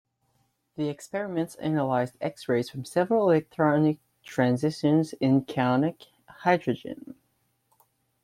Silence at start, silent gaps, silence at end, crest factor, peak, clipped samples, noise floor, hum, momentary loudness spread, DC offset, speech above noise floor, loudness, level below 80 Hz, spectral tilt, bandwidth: 0.8 s; none; 1.1 s; 18 dB; -8 dBFS; under 0.1%; -72 dBFS; none; 11 LU; under 0.1%; 47 dB; -26 LUFS; -68 dBFS; -7 dB/octave; 14 kHz